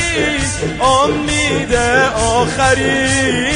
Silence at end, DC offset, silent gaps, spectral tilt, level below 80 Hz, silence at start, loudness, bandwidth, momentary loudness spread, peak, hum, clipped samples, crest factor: 0 s; under 0.1%; none; -3.5 dB/octave; -30 dBFS; 0 s; -14 LUFS; 10.5 kHz; 3 LU; -2 dBFS; none; under 0.1%; 12 dB